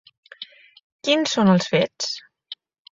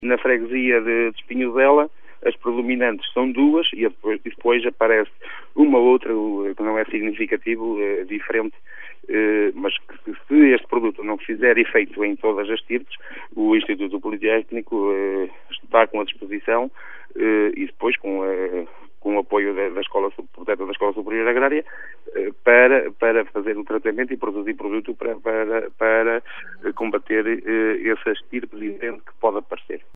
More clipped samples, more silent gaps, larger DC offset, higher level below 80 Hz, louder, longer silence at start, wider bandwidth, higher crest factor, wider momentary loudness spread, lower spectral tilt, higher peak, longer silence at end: neither; first, 0.83-0.99 s vs none; second, under 0.1% vs 2%; about the same, -62 dBFS vs -66 dBFS; about the same, -20 LUFS vs -21 LUFS; first, 0.4 s vs 0 s; first, 7.8 kHz vs 3.9 kHz; about the same, 20 dB vs 20 dB; first, 22 LU vs 14 LU; second, -5 dB/octave vs -7.5 dB/octave; second, -4 dBFS vs 0 dBFS; first, 0.45 s vs 0.15 s